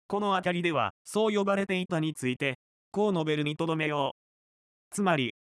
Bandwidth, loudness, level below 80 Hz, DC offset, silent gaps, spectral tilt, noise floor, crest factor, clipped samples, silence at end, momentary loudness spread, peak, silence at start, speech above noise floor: 13.5 kHz; -29 LUFS; -72 dBFS; under 0.1%; 0.90-1.05 s, 2.55-2.92 s, 4.11-4.91 s; -5.5 dB/octave; under -90 dBFS; 16 dB; under 0.1%; 0.15 s; 5 LU; -14 dBFS; 0.1 s; over 62 dB